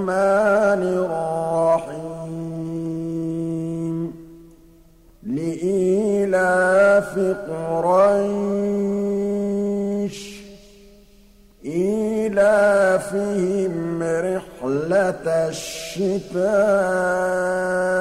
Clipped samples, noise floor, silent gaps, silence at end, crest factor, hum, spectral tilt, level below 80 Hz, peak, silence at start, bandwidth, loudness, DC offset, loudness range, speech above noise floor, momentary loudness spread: under 0.1%; -50 dBFS; none; 0 s; 14 dB; none; -6 dB/octave; -52 dBFS; -6 dBFS; 0 s; 15 kHz; -21 LUFS; under 0.1%; 7 LU; 30 dB; 13 LU